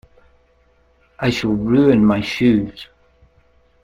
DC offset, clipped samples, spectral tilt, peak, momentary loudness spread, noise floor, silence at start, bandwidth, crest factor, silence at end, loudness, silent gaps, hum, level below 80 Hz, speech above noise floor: under 0.1%; under 0.1%; -7 dB/octave; -2 dBFS; 11 LU; -57 dBFS; 1.2 s; 12 kHz; 18 dB; 1 s; -16 LUFS; none; none; -44 dBFS; 41 dB